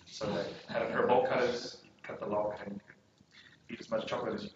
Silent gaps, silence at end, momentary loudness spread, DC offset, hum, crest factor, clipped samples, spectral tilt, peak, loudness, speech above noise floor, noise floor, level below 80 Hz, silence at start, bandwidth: none; 0.05 s; 19 LU; under 0.1%; none; 20 dB; under 0.1%; -3.5 dB/octave; -14 dBFS; -34 LUFS; 27 dB; -62 dBFS; -70 dBFS; 0.05 s; 8 kHz